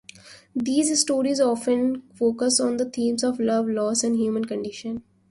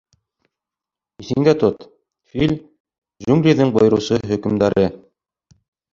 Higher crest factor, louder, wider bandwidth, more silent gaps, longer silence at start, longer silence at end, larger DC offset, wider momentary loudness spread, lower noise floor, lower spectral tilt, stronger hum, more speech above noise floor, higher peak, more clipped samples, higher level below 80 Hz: about the same, 16 dB vs 18 dB; second, -23 LUFS vs -17 LUFS; first, 11.5 kHz vs 7.6 kHz; second, none vs 2.80-2.85 s, 2.98-3.02 s; second, 0.25 s vs 1.2 s; second, 0.3 s vs 0.95 s; neither; second, 10 LU vs 14 LU; second, -47 dBFS vs -88 dBFS; second, -3 dB/octave vs -7 dB/octave; neither; second, 24 dB vs 72 dB; second, -6 dBFS vs -2 dBFS; neither; second, -64 dBFS vs -48 dBFS